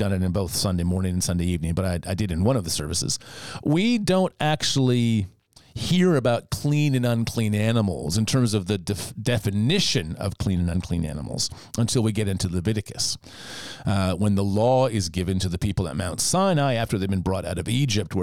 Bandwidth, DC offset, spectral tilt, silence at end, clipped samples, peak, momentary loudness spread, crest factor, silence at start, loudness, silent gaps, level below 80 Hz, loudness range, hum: 16.5 kHz; 0.4%; -5 dB/octave; 0 s; under 0.1%; -8 dBFS; 7 LU; 14 dB; 0 s; -24 LUFS; none; -46 dBFS; 3 LU; none